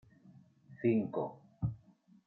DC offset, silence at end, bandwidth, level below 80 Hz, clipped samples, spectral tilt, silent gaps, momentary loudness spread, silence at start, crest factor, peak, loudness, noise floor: under 0.1%; 0.5 s; 4.1 kHz; -62 dBFS; under 0.1%; -11.5 dB/octave; none; 11 LU; 0.25 s; 20 dB; -18 dBFS; -36 LUFS; -64 dBFS